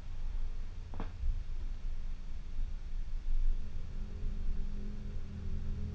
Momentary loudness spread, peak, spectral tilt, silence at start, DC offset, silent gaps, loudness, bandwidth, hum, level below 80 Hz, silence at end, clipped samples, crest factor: 6 LU; -20 dBFS; -7.5 dB/octave; 0 s; under 0.1%; none; -44 LUFS; 4.7 kHz; none; -34 dBFS; 0 s; under 0.1%; 12 dB